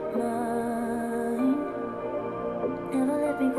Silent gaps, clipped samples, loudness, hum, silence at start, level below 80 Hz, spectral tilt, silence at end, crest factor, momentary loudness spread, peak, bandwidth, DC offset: none; under 0.1%; -29 LUFS; none; 0 s; -58 dBFS; -6.5 dB/octave; 0 s; 14 dB; 6 LU; -14 dBFS; 13.5 kHz; under 0.1%